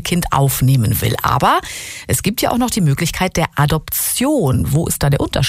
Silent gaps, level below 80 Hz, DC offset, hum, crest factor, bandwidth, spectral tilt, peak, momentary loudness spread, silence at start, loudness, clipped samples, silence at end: none; -34 dBFS; under 0.1%; none; 14 dB; 16 kHz; -5 dB/octave; -2 dBFS; 3 LU; 0 s; -16 LUFS; under 0.1%; 0 s